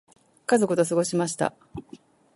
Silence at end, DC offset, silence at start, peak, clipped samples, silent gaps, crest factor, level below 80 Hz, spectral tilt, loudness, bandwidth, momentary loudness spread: 0.4 s; under 0.1%; 0.5 s; -8 dBFS; under 0.1%; none; 20 dB; -60 dBFS; -5 dB/octave; -24 LUFS; 11.5 kHz; 20 LU